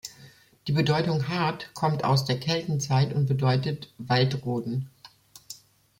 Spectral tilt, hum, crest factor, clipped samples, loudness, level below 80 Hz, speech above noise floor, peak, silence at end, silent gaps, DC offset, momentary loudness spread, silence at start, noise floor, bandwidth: -6 dB/octave; none; 18 dB; under 0.1%; -26 LUFS; -60 dBFS; 28 dB; -8 dBFS; 0.45 s; none; under 0.1%; 18 LU; 0.05 s; -53 dBFS; 16.5 kHz